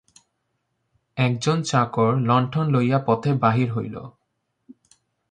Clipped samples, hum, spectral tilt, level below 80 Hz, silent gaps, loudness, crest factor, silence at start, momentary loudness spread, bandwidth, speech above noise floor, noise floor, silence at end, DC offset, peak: under 0.1%; none; -6.5 dB/octave; -60 dBFS; none; -21 LUFS; 20 dB; 1.15 s; 9 LU; 9.6 kHz; 54 dB; -75 dBFS; 0.6 s; under 0.1%; -4 dBFS